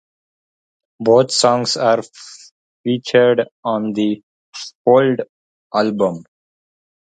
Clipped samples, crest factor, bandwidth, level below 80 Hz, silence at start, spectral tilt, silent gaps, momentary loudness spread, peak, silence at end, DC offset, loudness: under 0.1%; 18 dB; 9.4 kHz; -64 dBFS; 1 s; -4.5 dB/octave; 2.51-2.84 s, 3.51-3.63 s, 4.23-4.53 s, 4.75-4.85 s, 5.29-5.70 s; 20 LU; 0 dBFS; 0.8 s; under 0.1%; -16 LUFS